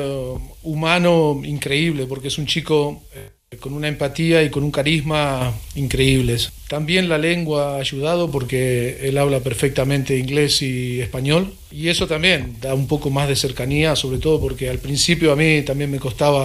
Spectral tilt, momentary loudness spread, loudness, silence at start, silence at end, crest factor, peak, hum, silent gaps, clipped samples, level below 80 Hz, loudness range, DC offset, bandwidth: -5 dB/octave; 9 LU; -19 LUFS; 0 s; 0 s; 18 dB; 0 dBFS; none; none; under 0.1%; -36 dBFS; 2 LU; under 0.1%; 15.5 kHz